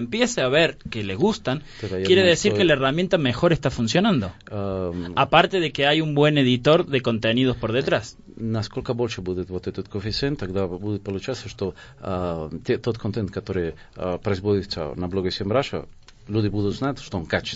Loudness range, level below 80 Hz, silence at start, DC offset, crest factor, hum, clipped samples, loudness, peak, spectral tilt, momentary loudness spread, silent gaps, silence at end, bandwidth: 8 LU; -46 dBFS; 0 s; under 0.1%; 22 dB; none; under 0.1%; -23 LUFS; 0 dBFS; -5.5 dB/octave; 13 LU; none; 0 s; 8 kHz